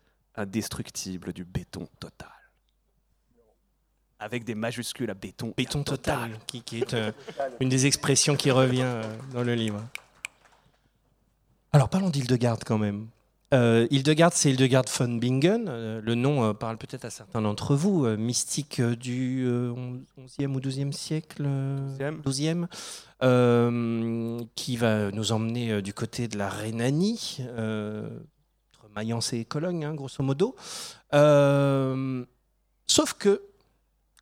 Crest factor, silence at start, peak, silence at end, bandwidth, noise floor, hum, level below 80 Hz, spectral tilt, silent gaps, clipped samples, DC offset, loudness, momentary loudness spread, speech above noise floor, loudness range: 24 dB; 0.35 s; -4 dBFS; 0.75 s; 16 kHz; -71 dBFS; none; -58 dBFS; -5 dB/octave; none; under 0.1%; under 0.1%; -26 LUFS; 16 LU; 44 dB; 10 LU